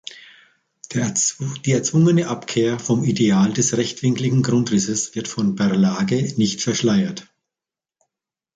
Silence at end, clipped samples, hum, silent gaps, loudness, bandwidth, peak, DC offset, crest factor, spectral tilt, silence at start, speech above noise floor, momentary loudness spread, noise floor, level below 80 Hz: 1.35 s; under 0.1%; none; none; -19 LUFS; 9.6 kHz; -6 dBFS; under 0.1%; 14 dB; -5 dB/octave; 0.1 s; 70 dB; 7 LU; -89 dBFS; -58 dBFS